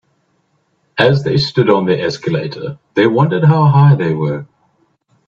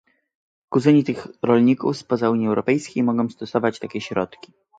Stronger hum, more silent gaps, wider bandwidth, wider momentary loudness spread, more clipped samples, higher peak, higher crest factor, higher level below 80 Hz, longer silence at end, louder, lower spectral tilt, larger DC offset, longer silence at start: neither; neither; second, 7.2 kHz vs 9 kHz; about the same, 12 LU vs 10 LU; neither; first, 0 dBFS vs -4 dBFS; about the same, 14 dB vs 18 dB; first, -52 dBFS vs -62 dBFS; first, 0.85 s vs 0.5 s; first, -13 LUFS vs -21 LUFS; about the same, -8 dB/octave vs -7 dB/octave; neither; first, 0.95 s vs 0.7 s